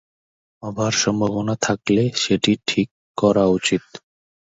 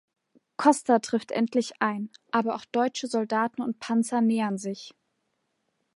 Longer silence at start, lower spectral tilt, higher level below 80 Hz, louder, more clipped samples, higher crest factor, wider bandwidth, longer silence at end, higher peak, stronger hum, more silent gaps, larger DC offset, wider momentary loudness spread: about the same, 0.65 s vs 0.6 s; about the same, -4.5 dB/octave vs -4.5 dB/octave; first, -52 dBFS vs -80 dBFS; first, -20 LUFS vs -26 LUFS; neither; about the same, 18 dB vs 22 dB; second, 8 kHz vs 11.5 kHz; second, 0.55 s vs 1.05 s; about the same, -4 dBFS vs -6 dBFS; neither; first, 2.91-3.14 s vs none; neither; second, 8 LU vs 11 LU